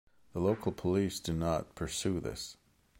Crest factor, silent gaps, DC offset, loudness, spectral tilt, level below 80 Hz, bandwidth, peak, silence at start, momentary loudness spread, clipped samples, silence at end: 18 dB; none; under 0.1%; -34 LUFS; -5.5 dB/octave; -52 dBFS; 16.5 kHz; -16 dBFS; 0.35 s; 10 LU; under 0.1%; 0.45 s